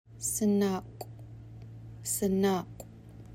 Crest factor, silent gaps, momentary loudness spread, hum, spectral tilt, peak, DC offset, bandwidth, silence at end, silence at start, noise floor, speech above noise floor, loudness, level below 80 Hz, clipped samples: 16 dB; none; 21 LU; none; -5 dB/octave; -16 dBFS; under 0.1%; 16.5 kHz; 0 s; 0.1 s; -49 dBFS; 20 dB; -30 LUFS; -58 dBFS; under 0.1%